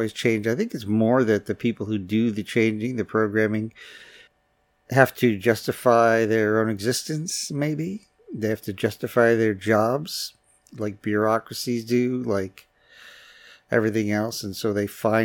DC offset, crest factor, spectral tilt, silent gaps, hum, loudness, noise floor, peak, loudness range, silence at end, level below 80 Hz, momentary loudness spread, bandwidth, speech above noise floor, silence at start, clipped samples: under 0.1%; 22 dB; -5.5 dB/octave; none; none; -23 LUFS; -67 dBFS; -2 dBFS; 5 LU; 0 s; -66 dBFS; 10 LU; 18 kHz; 45 dB; 0 s; under 0.1%